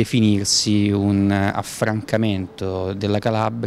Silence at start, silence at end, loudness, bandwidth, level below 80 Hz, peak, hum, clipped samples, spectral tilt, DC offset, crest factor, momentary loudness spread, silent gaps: 0 s; 0 s; -20 LUFS; 15 kHz; -52 dBFS; -4 dBFS; none; under 0.1%; -5 dB/octave; under 0.1%; 16 dB; 8 LU; none